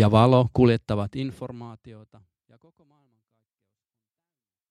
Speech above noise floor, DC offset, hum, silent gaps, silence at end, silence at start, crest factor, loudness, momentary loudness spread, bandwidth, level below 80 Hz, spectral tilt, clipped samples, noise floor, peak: over 67 dB; under 0.1%; none; none; 2.75 s; 0 s; 22 dB; -21 LUFS; 22 LU; 10.5 kHz; -52 dBFS; -8.5 dB/octave; under 0.1%; under -90 dBFS; -4 dBFS